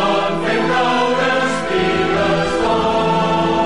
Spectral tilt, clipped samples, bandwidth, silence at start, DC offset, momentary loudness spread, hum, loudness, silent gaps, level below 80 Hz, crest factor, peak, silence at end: -5 dB/octave; under 0.1%; 11.5 kHz; 0 s; 2%; 2 LU; none; -16 LUFS; none; -42 dBFS; 10 dB; -8 dBFS; 0 s